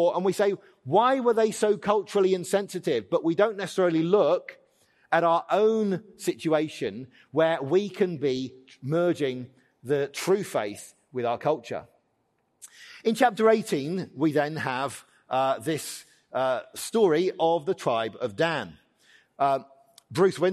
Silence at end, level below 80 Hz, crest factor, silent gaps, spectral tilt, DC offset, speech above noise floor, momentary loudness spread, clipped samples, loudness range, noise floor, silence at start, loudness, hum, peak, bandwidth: 0 s; -74 dBFS; 18 dB; none; -5.5 dB/octave; under 0.1%; 47 dB; 13 LU; under 0.1%; 4 LU; -72 dBFS; 0 s; -26 LUFS; none; -8 dBFS; 13 kHz